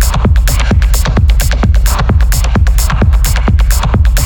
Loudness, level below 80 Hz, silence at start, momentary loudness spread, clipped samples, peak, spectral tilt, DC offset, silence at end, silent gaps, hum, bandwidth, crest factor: -11 LUFS; -10 dBFS; 0 s; 1 LU; under 0.1%; 0 dBFS; -5 dB/octave; under 0.1%; 0 s; none; none; 20 kHz; 8 dB